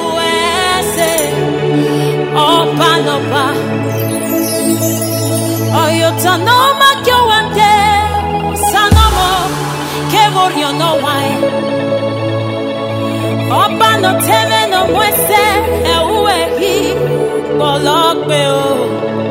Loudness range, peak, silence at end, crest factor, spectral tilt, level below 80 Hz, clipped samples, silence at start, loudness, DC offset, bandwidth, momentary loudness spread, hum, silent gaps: 3 LU; 0 dBFS; 0 s; 12 dB; -4 dB/octave; -28 dBFS; under 0.1%; 0 s; -11 LUFS; under 0.1%; 16.5 kHz; 7 LU; none; none